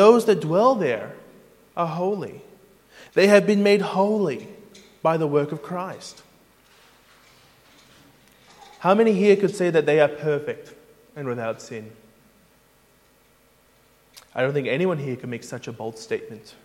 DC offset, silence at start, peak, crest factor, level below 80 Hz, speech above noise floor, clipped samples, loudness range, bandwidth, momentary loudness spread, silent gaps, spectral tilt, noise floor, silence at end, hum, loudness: under 0.1%; 0 s; -2 dBFS; 22 dB; -68 dBFS; 37 dB; under 0.1%; 15 LU; 15.5 kHz; 19 LU; none; -6 dB/octave; -58 dBFS; 0.25 s; none; -22 LUFS